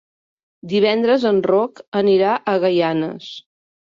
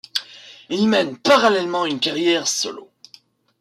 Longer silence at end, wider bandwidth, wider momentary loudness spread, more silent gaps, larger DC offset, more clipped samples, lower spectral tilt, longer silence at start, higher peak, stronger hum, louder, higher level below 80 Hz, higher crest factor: second, 0.5 s vs 0.75 s; second, 7.4 kHz vs 15.5 kHz; about the same, 12 LU vs 13 LU; first, 1.88-1.92 s vs none; neither; neither; first, -7 dB/octave vs -3 dB/octave; first, 0.65 s vs 0.15 s; about the same, -4 dBFS vs -4 dBFS; neither; about the same, -18 LUFS vs -19 LUFS; about the same, -64 dBFS vs -68 dBFS; about the same, 14 dB vs 16 dB